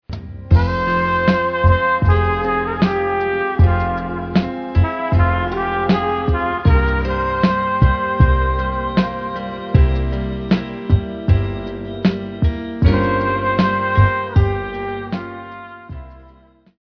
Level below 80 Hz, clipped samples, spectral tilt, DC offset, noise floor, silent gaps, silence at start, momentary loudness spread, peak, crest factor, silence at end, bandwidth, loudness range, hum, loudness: -24 dBFS; under 0.1%; -9 dB/octave; under 0.1%; -49 dBFS; none; 0.1 s; 10 LU; 0 dBFS; 16 dB; 0.65 s; 5.4 kHz; 3 LU; none; -18 LUFS